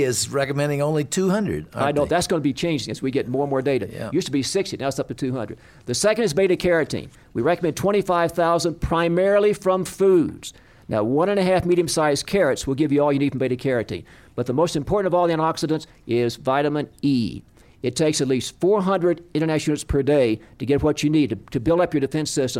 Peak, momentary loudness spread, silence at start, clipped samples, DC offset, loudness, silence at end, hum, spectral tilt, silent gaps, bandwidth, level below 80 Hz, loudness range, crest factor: -8 dBFS; 8 LU; 0 s; under 0.1%; under 0.1%; -21 LUFS; 0 s; none; -5.5 dB/octave; none; 16.5 kHz; -44 dBFS; 3 LU; 14 dB